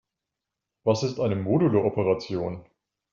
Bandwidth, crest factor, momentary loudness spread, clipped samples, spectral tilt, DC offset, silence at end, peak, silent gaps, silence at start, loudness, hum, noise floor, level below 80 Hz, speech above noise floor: 7.4 kHz; 18 dB; 9 LU; under 0.1%; -7 dB/octave; under 0.1%; 0.5 s; -8 dBFS; none; 0.85 s; -25 LUFS; none; -86 dBFS; -62 dBFS; 62 dB